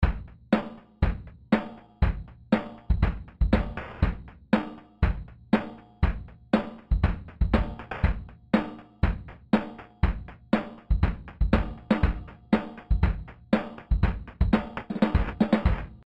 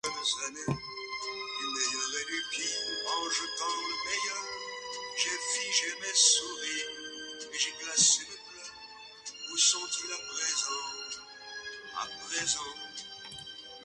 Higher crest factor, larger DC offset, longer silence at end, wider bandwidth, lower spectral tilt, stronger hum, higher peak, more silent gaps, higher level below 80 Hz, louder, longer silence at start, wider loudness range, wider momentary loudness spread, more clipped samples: about the same, 20 dB vs 24 dB; neither; first, 0.15 s vs 0 s; second, 5.4 kHz vs 11.5 kHz; first, -9 dB/octave vs 0 dB/octave; neither; about the same, -8 dBFS vs -10 dBFS; neither; first, -30 dBFS vs -70 dBFS; about the same, -28 LUFS vs -30 LUFS; about the same, 0 s vs 0.05 s; second, 1 LU vs 6 LU; second, 12 LU vs 18 LU; neither